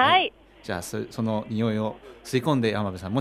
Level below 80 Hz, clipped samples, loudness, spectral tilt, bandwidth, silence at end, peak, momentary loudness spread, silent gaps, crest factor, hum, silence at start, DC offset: -58 dBFS; under 0.1%; -26 LUFS; -5.5 dB/octave; 15.5 kHz; 0 s; -8 dBFS; 11 LU; none; 18 dB; none; 0 s; under 0.1%